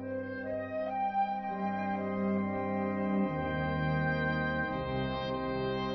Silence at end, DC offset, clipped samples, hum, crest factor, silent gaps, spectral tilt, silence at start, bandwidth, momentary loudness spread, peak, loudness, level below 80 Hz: 0 s; under 0.1%; under 0.1%; none; 12 dB; none; -5.5 dB/octave; 0 s; 6 kHz; 5 LU; -20 dBFS; -33 LUFS; -52 dBFS